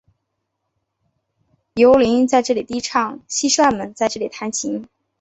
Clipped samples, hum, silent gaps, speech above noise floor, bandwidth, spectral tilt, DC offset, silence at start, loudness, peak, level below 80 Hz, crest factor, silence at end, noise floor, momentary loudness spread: under 0.1%; none; none; 58 dB; 8.2 kHz; -3 dB/octave; under 0.1%; 1.75 s; -18 LUFS; -2 dBFS; -54 dBFS; 18 dB; 0.35 s; -75 dBFS; 12 LU